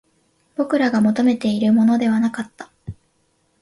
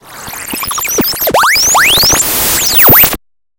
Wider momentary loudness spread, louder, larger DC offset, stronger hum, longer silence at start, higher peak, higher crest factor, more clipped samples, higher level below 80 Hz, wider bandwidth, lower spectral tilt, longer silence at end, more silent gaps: first, 21 LU vs 16 LU; second, -18 LUFS vs -6 LUFS; neither; neither; first, 0.6 s vs 0.05 s; second, -6 dBFS vs 0 dBFS; about the same, 14 dB vs 10 dB; second, under 0.1% vs 0.5%; second, -54 dBFS vs -32 dBFS; second, 11.5 kHz vs over 20 kHz; first, -6.5 dB/octave vs -1 dB/octave; first, 0.7 s vs 0.4 s; neither